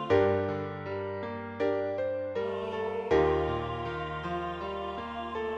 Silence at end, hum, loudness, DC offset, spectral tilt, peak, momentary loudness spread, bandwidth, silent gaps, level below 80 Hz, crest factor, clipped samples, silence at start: 0 s; none; -32 LUFS; under 0.1%; -7.5 dB/octave; -10 dBFS; 10 LU; 7.4 kHz; none; -50 dBFS; 20 dB; under 0.1%; 0 s